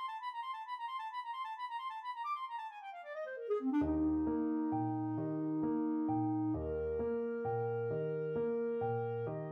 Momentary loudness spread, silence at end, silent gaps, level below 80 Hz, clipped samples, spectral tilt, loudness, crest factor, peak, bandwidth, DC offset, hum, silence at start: 9 LU; 0 s; none; -58 dBFS; under 0.1%; -9 dB/octave; -38 LUFS; 12 dB; -26 dBFS; 5.6 kHz; under 0.1%; none; 0 s